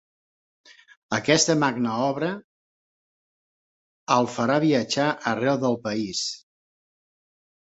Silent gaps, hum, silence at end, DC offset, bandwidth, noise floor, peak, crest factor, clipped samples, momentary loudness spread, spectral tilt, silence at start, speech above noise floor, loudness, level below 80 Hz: 2.44-4.07 s; none; 1.35 s; under 0.1%; 8.4 kHz; under -90 dBFS; -4 dBFS; 22 dB; under 0.1%; 10 LU; -4 dB/octave; 1.1 s; over 67 dB; -23 LUFS; -66 dBFS